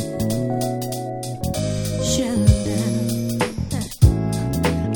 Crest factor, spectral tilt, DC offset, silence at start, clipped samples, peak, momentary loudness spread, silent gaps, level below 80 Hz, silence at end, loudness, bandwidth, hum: 18 dB; -6 dB/octave; under 0.1%; 0 s; under 0.1%; -2 dBFS; 9 LU; none; -30 dBFS; 0 s; -21 LUFS; 19.5 kHz; none